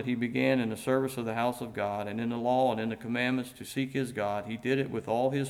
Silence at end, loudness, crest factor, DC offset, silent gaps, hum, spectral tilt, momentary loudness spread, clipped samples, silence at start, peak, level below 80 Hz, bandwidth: 0 s; -31 LUFS; 16 dB; under 0.1%; none; none; -6 dB/octave; 6 LU; under 0.1%; 0 s; -14 dBFS; -66 dBFS; 15.5 kHz